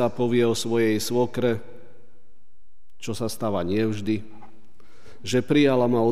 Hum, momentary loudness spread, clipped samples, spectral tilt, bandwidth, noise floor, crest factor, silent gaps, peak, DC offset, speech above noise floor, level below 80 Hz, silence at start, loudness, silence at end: none; 11 LU; under 0.1%; -5.5 dB/octave; 15.5 kHz; -65 dBFS; 18 dB; none; -8 dBFS; 2%; 42 dB; -60 dBFS; 0 s; -24 LUFS; 0 s